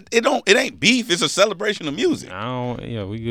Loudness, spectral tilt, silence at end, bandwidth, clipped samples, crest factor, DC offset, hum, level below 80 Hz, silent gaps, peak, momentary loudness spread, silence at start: -19 LUFS; -3.5 dB/octave; 0 s; 17.5 kHz; under 0.1%; 20 dB; under 0.1%; none; -54 dBFS; none; 0 dBFS; 11 LU; 0.1 s